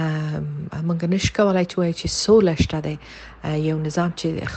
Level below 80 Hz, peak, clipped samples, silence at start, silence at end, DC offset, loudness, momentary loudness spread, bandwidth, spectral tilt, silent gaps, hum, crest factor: -40 dBFS; -4 dBFS; under 0.1%; 0 s; 0 s; under 0.1%; -21 LUFS; 13 LU; 9 kHz; -5.5 dB/octave; none; none; 18 dB